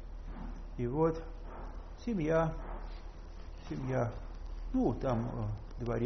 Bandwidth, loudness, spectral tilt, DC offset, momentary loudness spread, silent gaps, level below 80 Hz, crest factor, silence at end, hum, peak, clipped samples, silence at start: 6.4 kHz; -36 LUFS; -8 dB/octave; under 0.1%; 17 LU; none; -44 dBFS; 16 dB; 0 s; none; -18 dBFS; under 0.1%; 0 s